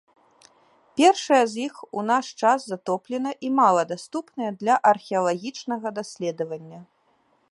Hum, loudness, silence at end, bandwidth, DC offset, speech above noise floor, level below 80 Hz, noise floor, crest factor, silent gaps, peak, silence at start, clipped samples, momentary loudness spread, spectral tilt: none; -23 LUFS; 0.7 s; 11.5 kHz; under 0.1%; 42 dB; -78 dBFS; -65 dBFS; 20 dB; none; -4 dBFS; 0.95 s; under 0.1%; 13 LU; -4 dB/octave